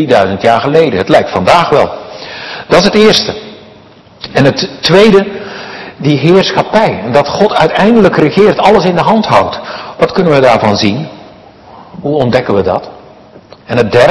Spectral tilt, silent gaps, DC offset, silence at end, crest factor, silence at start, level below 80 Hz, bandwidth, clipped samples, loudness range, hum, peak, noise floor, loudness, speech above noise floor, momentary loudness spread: -5.5 dB/octave; none; under 0.1%; 0 s; 10 dB; 0 s; -40 dBFS; 12 kHz; 4%; 4 LU; none; 0 dBFS; -38 dBFS; -9 LUFS; 30 dB; 15 LU